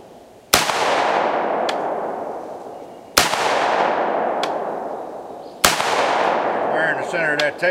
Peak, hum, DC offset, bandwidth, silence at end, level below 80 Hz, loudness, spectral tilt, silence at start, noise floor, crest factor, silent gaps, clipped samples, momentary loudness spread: 0 dBFS; none; under 0.1%; 16 kHz; 0 s; -52 dBFS; -19 LUFS; -1.5 dB/octave; 0 s; -44 dBFS; 20 dB; none; under 0.1%; 15 LU